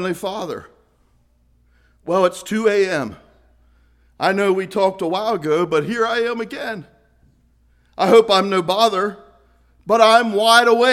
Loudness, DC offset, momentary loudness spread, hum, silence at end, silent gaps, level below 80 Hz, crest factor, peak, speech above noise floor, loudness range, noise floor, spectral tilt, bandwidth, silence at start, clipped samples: -17 LUFS; under 0.1%; 16 LU; none; 0 s; none; -58 dBFS; 18 dB; 0 dBFS; 42 dB; 6 LU; -58 dBFS; -4 dB/octave; 15.5 kHz; 0 s; under 0.1%